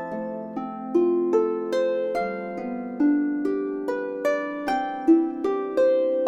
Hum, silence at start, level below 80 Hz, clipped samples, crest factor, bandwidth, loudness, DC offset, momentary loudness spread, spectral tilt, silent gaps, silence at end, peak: none; 0 s; -64 dBFS; under 0.1%; 16 dB; 10 kHz; -25 LUFS; under 0.1%; 11 LU; -6.5 dB/octave; none; 0 s; -8 dBFS